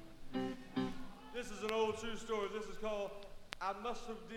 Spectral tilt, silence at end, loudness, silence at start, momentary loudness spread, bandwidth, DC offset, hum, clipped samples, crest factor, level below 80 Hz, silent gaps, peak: -4.5 dB/octave; 0 s; -42 LUFS; 0 s; 10 LU; 16.5 kHz; under 0.1%; none; under 0.1%; 22 dB; -56 dBFS; none; -20 dBFS